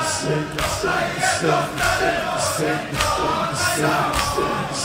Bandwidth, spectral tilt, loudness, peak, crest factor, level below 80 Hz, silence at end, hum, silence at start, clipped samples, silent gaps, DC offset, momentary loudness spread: 16 kHz; -3.5 dB/octave; -20 LUFS; -2 dBFS; 20 dB; -40 dBFS; 0 s; none; 0 s; under 0.1%; none; under 0.1%; 4 LU